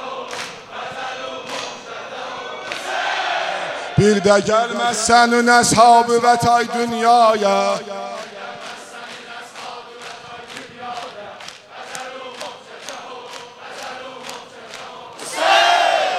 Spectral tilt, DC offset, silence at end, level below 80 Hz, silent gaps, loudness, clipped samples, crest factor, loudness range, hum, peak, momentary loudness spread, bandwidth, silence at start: -3.5 dB/octave; under 0.1%; 0 s; -54 dBFS; none; -16 LUFS; under 0.1%; 20 dB; 19 LU; none; 0 dBFS; 21 LU; 14.5 kHz; 0 s